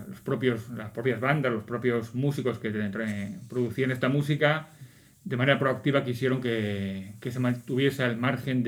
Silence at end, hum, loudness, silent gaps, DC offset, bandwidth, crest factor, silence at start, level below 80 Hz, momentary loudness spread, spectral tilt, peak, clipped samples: 0 s; none; -28 LUFS; none; under 0.1%; 17 kHz; 22 dB; 0 s; -66 dBFS; 9 LU; -7 dB/octave; -6 dBFS; under 0.1%